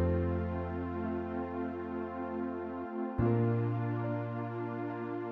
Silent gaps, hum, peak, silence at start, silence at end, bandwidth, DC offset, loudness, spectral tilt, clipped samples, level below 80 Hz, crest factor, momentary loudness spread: none; none; -18 dBFS; 0 s; 0 s; 4.4 kHz; under 0.1%; -35 LUFS; -11 dB/octave; under 0.1%; -50 dBFS; 16 dB; 7 LU